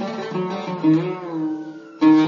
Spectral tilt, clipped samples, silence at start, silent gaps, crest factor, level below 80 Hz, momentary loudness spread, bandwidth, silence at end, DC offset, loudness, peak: -7.5 dB/octave; under 0.1%; 0 s; none; 16 dB; -72 dBFS; 10 LU; 6.8 kHz; 0 s; under 0.1%; -22 LUFS; -4 dBFS